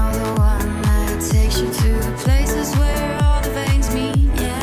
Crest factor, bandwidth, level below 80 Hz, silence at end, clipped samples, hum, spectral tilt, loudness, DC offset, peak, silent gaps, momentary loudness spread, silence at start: 10 dB; 16 kHz; -18 dBFS; 0 s; under 0.1%; none; -5.5 dB/octave; -19 LUFS; under 0.1%; -6 dBFS; none; 2 LU; 0 s